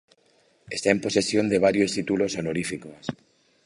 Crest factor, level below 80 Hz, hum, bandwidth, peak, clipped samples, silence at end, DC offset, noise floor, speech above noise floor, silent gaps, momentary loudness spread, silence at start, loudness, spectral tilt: 22 dB; -58 dBFS; none; 11.5 kHz; -2 dBFS; under 0.1%; 0.5 s; under 0.1%; -63 dBFS; 39 dB; none; 14 LU; 0.7 s; -24 LUFS; -4.5 dB/octave